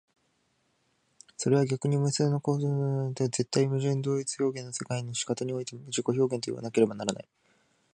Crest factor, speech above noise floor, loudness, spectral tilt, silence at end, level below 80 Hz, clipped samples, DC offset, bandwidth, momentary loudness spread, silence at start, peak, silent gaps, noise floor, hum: 20 dB; 44 dB; -29 LUFS; -5.5 dB/octave; 0.75 s; -72 dBFS; under 0.1%; under 0.1%; 10 kHz; 8 LU; 1.4 s; -10 dBFS; none; -73 dBFS; none